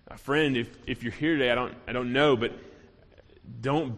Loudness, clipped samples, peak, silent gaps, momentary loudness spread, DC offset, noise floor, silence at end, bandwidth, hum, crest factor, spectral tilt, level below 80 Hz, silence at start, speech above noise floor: -27 LUFS; under 0.1%; -10 dBFS; none; 11 LU; under 0.1%; -55 dBFS; 0 s; 13 kHz; none; 18 dB; -6.5 dB/octave; -54 dBFS; 0.1 s; 28 dB